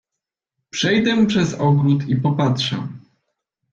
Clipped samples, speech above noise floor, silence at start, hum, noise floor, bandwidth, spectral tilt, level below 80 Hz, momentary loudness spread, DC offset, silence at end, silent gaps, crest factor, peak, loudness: under 0.1%; 66 dB; 0.75 s; none; -84 dBFS; 7.6 kHz; -6 dB/octave; -54 dBFS; 10 LU; under 0.1%; 0.75 s; none; 14 dB; -6 dBFS; -18 LUFS